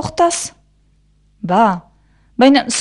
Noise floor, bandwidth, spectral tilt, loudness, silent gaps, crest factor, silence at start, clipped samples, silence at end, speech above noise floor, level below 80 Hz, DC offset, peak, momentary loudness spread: -55 dBFS; 11.5 kHz; -4 dB/octave; -14 LUFS; none; 16 dB; 0 s; under 0.1%; 0 s; 42 dB; -50 dBFS; under 0.1%; 0 dBFS; 17 LU